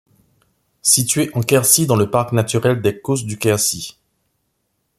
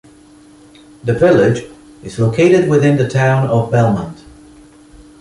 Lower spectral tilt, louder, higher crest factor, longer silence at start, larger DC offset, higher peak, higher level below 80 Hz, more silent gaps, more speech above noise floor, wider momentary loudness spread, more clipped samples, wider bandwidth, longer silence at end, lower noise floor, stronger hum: second, -4 dB/octave vs -7.5 dB/octave; second, -16 LUFS vs -13 LUFS; about the same, 18 dB vs 14 dB; second, 0.85 s vs 1.05 s; neither; about the same, 0 dBFS vs -2 dBFS; second, -54 dBFS vs -44 dBFS; neither; first, 53 dB vs 31 dB; second, 9 LU vs 14 LU; neither; first, 16 kHz vs 11.5 kHz; about the same, 1.1 s vs 1.1 s; first, -70 dBFS vs -43 dBFS; neither